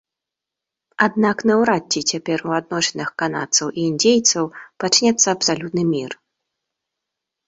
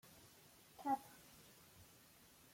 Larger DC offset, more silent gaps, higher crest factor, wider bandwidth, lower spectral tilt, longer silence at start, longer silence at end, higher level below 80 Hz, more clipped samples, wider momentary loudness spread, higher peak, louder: neither; neither; about the same, 18 dB vs 22 dB; second, 8.2 kHz vs 16.5 kHz; about the same, -3 dB/octave vs -4 dB/octave; first, 1 s vs 0.05 s; first, 1.35 s vs 0 s; first, -62 dBFS vs -82 dBFS; neither; second, 9 LU vs 21 LU; first, -2 dBFS vs -30 dBFS; first, -18 LUFS vs -45 LUFS